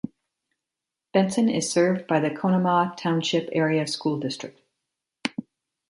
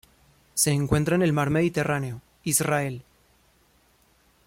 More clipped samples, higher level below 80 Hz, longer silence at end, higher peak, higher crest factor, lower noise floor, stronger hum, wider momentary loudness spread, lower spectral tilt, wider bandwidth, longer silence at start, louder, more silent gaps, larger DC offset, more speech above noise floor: neither; second, -68 dBFS vs -50 dBFS; second, 0.5 s vs 1.45 s; about the same, -6 dBFS vs -8 dBFS; about the same, 18 dB vs 20 dB; first, -87 dBFS vs -62 dBFS; neither; about the same, 11 LU vs 11 LU; about the same, -5 dB/octave vs -4.5 dB/octave; second, 11.5 kHz vs 16.5 kHz; second, 0.05 s vs 0.55 s; about the same, -24 LUFS vs -24 LUFS; neither; neither; first, 64 dB vs 39 dB